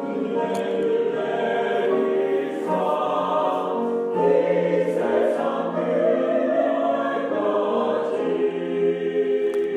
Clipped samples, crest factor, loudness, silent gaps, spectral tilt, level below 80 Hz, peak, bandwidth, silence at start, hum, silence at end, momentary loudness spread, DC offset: under 0.1%; 14 dB; -22 LUFS; none; -7 dB/octave; -78 dBFS; -8 dBFS; 11 kHz; 0 s; none; 0 s; 4 LU; under 0.1%